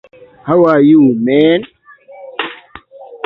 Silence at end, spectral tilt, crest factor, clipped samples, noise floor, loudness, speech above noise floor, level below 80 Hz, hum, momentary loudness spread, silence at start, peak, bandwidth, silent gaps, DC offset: 0.1 s; -9.5 dB/octave; 12 dB; under 0.1%; -37 dBFS; -11 LUFS; 28 dB; -54 dBFS; none; 17 LU; 0.45 s; 0 dBFS; 4.6 kHz; none; under 0.1%